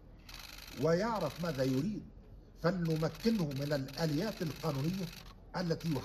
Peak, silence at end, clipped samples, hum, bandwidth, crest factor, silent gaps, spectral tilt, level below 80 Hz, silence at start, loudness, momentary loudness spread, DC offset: -18 dBFS; 0 s; under 0.1%; none; 14.5 kHz; 18 dB; none; -6.5 dB/octave; -56 dBFS; 0 s; -35 LUFS; 14 LU; under 0.1%